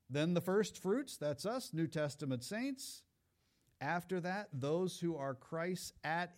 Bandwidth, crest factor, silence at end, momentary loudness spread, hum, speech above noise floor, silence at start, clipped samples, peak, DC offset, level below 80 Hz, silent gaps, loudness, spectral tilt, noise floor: 16 kHz; 16 dB; 0.05 s; 7 LU; none; 40 dB; 0.1 s; under 0.1%; -24 dBFS; under 0.1%; -78 dBFS; none; -40 LUFS; -5.5 dB/octave; -79 dBFS